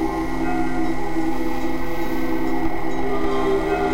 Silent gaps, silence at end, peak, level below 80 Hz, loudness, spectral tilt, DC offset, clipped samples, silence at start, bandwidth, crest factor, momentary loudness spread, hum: none; 0 s; -8 dBFS; -34 dBFS; -24 LUFS; -6.5 dB/octave; 10%; under 0.1%; 0 s; 16 kHz; 14 dB; 5 LU; none